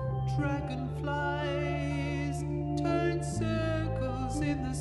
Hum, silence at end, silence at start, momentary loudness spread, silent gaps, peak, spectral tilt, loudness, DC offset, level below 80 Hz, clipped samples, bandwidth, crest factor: none; 0 s; 0 s; 4 LU; none; -16 dBFS; -6.5 dB/octave; -32 LUFS; under 0.1%; -42 dBFS; under 0.1%; 11.5 kHz; 14 dB